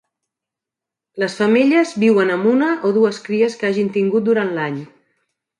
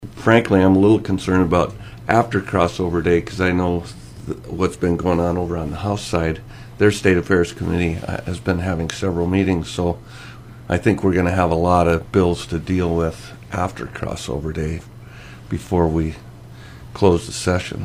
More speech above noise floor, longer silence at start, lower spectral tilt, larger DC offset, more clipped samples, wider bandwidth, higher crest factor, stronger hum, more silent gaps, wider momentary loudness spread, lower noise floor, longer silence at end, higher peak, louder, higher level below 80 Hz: first, 70 dB vs 20 dB; first, 1.15 s vs 0 s; about the same, -6 dB/octave vs -6.5 dB/octave; neither; neither; second, 11 kHz vs 15 kHz; second, 14 dB vs 20 dB; neither; neither; second, 9 LU vs 16 LU; first, -86 dBFS vs -38 dBFS; first, 0.75 s vs 0 s; second, -4 dBFS vs 0 dBFS; about the same, -17 LUFS vs -19 LUFS; second, -68 dBFS vs -38 dBFS